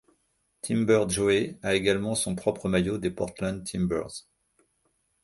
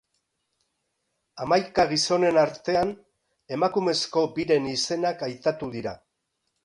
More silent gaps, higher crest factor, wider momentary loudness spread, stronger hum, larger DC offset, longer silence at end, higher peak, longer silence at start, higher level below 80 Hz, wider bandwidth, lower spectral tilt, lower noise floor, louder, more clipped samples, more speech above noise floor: neither; about the same, 20 dB vs 18 dB; second, 9 LU vs 12 LU; neither; neither; first, 1.05 s vs 0.7 s; about the same, -8 dBFS vs -8 dBFS; second, 0.65 s vs 1.35 s; first, -52 dBFS vs -60 dBFS; about the same, 12 kHz vs 11.5 kHz; about the same, -5 dB/octave vs -4 dB/octave; second, -73 dBFS vs -78 dBFS; about the same, -27 LUFS vs -25 LUFS; neither; second, 46 dB vs 54 dB